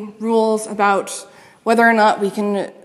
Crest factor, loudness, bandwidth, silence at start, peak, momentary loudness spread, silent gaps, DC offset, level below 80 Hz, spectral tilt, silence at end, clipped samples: 16 dB; -17 LUFS; 14 kHz; 0 s; -2 dBFS; 12 LU; none; under 0.1%; -74 dBFS; -4.5 dB/octave; 0.1 s; under 0.1%